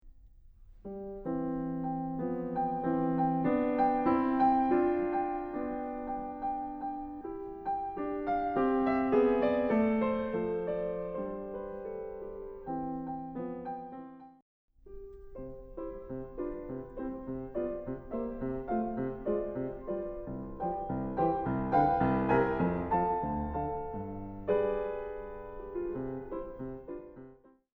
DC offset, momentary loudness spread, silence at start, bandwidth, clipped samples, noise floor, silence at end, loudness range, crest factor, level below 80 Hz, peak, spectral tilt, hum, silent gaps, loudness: under 0.1%; 15 LU; 0.05 s; 5 kHz; under 0.1%; -57 dBFS; 0.45 s; 12 LU; 18 dB; -52 dBFS; -14 dBFS; -10.5 dB/octave; none; 14.42-14.68 s; -33 LUFS